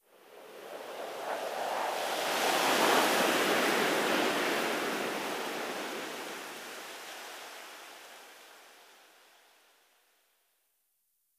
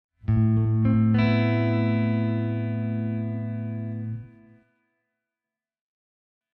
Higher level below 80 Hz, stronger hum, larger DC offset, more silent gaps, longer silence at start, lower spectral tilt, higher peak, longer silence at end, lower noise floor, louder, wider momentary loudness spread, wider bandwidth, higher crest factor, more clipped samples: second, -80 dBFS vs -48 dBFS; neither; neither; neither; about the same, 0.25 s vs 0.25 s; second, -2 dB/octave vs -10.5 dB/octave; about the same, -12 dBFS vs -10 dBFS; first, 2.55 s vs 2.3 s; second, -77 dBFS vs under -90 dBFS; second, -30 LUFS vs -24 LUFS; first, 21 LU vs 11 LU; first, 16 kHz vs 5.2 kHz; first, 22 dB vs 16 dB; neither